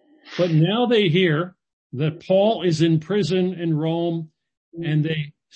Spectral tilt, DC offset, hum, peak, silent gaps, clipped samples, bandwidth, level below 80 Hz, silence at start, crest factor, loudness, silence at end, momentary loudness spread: -7 dB/octave; under 0.1%; none; -6 dBFS; 1.73-1.90 s, 4.57-4.72 s; under 0.1%; 8.6 kHz; -64 dBFS; 0.25 s; 16 dB; -21 LUFS; 0.25 s; 13 LU